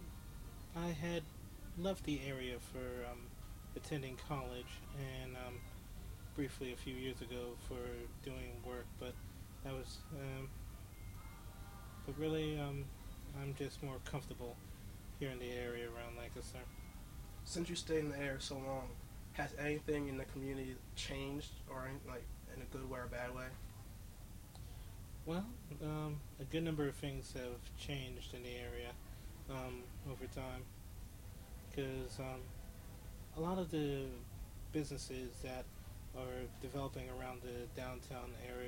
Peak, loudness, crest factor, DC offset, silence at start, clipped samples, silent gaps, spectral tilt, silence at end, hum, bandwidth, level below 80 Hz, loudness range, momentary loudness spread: -28 dBFS; -47 LUFS; 18 dB; under 0.1%; 0 s; under 0.1%; none; -5.5 dB/octave; 0 s; none; 16 kHz; -54 dBFS; 5 LU; 13 LU